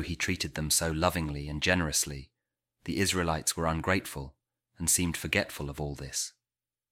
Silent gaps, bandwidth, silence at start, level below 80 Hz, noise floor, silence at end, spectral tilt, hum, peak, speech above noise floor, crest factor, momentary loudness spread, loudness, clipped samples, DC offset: none; 17.5 kHz; 0 s; -46 dBFS; under -90 dBFS; 0.6 s; -3 dB/octave; none; -10 dBFS; over 59 dB; 22 dB; 12 LU; -29 LUFS; under 0.1%; under 0.1%